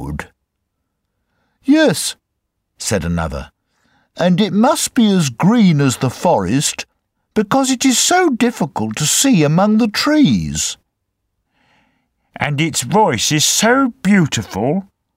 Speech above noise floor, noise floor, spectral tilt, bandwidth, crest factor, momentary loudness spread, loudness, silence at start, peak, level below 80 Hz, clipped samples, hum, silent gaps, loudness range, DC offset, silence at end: 59 dB; -73 dBFS; -4 dB/octave; 16 kHz; 16 dB; 11 LU; -15 LUFS; 0 s; 0 dBFS; -42 dBFS; under 0.1%; none; none; 6 LU; under 0.1%; 0.35 s